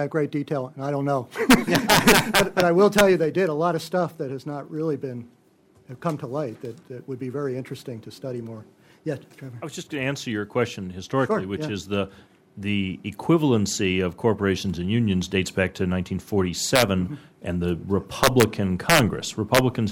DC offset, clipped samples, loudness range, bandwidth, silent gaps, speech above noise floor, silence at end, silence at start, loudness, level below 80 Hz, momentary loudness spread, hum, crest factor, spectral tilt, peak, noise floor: under 0.1%; under 0.1%; 13 LU; 16.5 kHz; none; 35 dB; 0 s; 0 s; -23 LUFS; -48 dBFS; 17 LU; none; 20 dB; -4.5 dB/octave; -4 dBFS; -58 dBFS